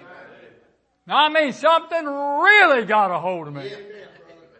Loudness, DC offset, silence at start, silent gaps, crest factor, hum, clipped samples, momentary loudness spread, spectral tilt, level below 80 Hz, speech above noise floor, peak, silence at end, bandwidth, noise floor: -17 LUFS; under 0.1%; 0.1 s; none; 18 dB; none; under 0.1%; 20 LU; -4 dB/octave; -76 dBFS; 41 dB; -2 dBFS; 0.55 s; 8.8 kHz; -60 dBFS